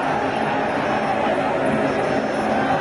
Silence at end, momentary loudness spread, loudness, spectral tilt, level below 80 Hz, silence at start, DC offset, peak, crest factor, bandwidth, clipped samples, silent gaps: 0 s; 1 LU; -21 LUFS; -6 dB/octave; -50 dBFS; 0 s; under 0.1%; -8 dBFS; 12 dB; 11.5 kHz; under 0.1%; none